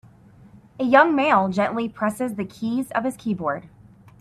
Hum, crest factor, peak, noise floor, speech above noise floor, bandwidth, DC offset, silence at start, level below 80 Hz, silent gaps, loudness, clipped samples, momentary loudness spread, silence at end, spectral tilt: none; 20 dB; -2 dBFS; -49 dBFS; 28 dB; 14.5 kHz; under 0.1%; 0.8 s; -60 dBFS; none; -22 LUFS; under 0.1%; 12 LU; 0.55 s; -6 dB/octave